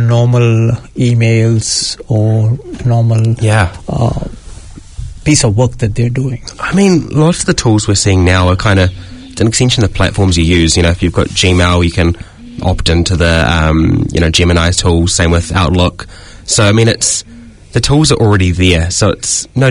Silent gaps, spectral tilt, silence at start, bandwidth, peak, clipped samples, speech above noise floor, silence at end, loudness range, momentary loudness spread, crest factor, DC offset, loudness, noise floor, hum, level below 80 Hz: none; -5 dB/octave; 0 s; 11 kHz; 0 dBFS; 0.2%; 20 dB; 0 s; 3 LU; 8 LU; 10 dB; under 0.1%; -11 LUFS; -30 dBFS; none; -26 dBFS